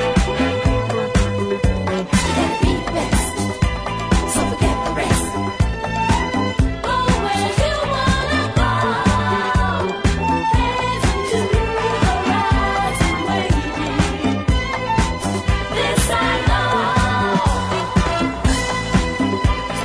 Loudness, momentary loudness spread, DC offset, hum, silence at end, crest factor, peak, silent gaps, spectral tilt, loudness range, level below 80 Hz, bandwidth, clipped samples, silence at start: -18 LUFS; 3 LU; under 0.1%; none; 0 s; 16 dB; -2 dBFS; none; -5 dB/octave; 1 LU; -26 dBFS; 11 kHz; under 0.1%; 0 s